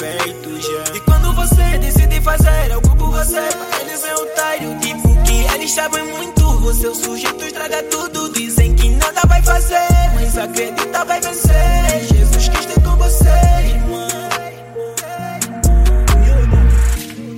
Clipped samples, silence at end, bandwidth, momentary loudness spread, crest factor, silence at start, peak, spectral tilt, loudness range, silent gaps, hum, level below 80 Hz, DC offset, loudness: under 0.1%; 0 s; 16.5 kHz; 8 LU; 12 dB; 0 s; 0 dBFS; -4.5 dB/octave; 3 LU; none; none; -14 dBFS; under 0.1%; -15 LUFS